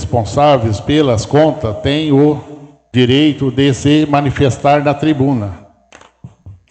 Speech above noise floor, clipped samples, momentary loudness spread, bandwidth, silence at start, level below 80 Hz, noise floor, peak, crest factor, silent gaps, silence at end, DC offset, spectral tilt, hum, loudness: 32 dB; under 0.1%; 5 LU; 8.8 kHz; 0 s; -38 dBFS; -44 dBFS; 0 dBFS; 12 dB; none; 0.15 s; under 0.1%; -6.5 dB/octave; none; -13 LUFS